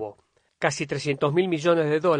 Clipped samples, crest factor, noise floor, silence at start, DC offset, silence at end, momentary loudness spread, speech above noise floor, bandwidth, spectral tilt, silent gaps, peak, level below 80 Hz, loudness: under 0.1%; 20 dB; -56 dBFS; 0 s; under 0.1%; 0 s; 6 LU; 33 dB; 9.8 kHz; -5.5 dB/octave; none; -4 dBFS; -66 dBFS; -24 LUFS